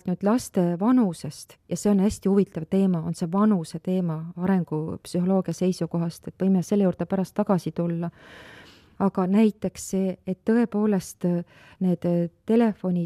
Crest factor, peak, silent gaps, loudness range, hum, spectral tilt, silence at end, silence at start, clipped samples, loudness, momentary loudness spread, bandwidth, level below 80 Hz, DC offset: 14 dB; -10 dBFS; none; 2 LU; none; -7.5 dB/octave; 0 s; 0.05 s; under 0.1%; -25 LUFS; 8 LU; 13.5 kHz; -58 dBFS; under 0.1%